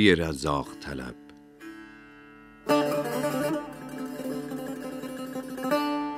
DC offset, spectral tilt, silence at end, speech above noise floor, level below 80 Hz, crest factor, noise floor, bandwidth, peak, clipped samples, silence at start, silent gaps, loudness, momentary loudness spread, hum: under 0.1%; -5 dB/octave; 0 s; 24 dB; -54 dBFS; 24 dB; -50 dBFS; 16 kHz; -6 dBFS; under 0.1%; 0 s; none; -30 LUFS; 22 LU; none